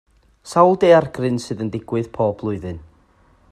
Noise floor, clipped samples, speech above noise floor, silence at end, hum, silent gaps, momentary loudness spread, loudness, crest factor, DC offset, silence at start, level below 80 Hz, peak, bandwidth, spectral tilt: -55 dBFS; under 0.1%; 37 dB; 0.7 s; none; none; 14 LU; -18 LUFS; 20 dB; under 0.1%; 0.45 s; -52 dBFS; 0 dBFS; 12.5 kHz; -6.5 dB/octave